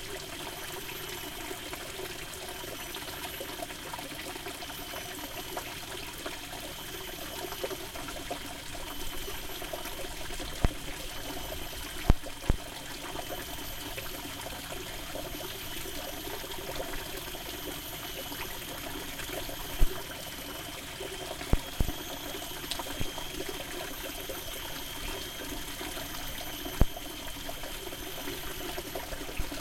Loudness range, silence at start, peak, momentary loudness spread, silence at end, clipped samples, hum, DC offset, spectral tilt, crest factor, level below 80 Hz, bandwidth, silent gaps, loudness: 2 LU; 0 s; -6 dBFS; 5 LU; 0 s; under 0.1%; none; under 0.1%; -3 dB/octave; 30 dB; -40 dBFS; 16.5 kHz; none; -37 LUFS